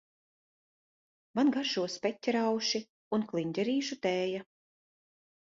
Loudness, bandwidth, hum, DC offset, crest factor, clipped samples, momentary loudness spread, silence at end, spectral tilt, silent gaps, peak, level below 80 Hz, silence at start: -32 LUFS; 7.8 kHz; none; under 0.1%; 16 dB; under 0.1%; 7 LU; 1 s; -4.5 dB/octave; 2.89-3.11 s; -18 dBFS; -78 dBFS; 1.35 s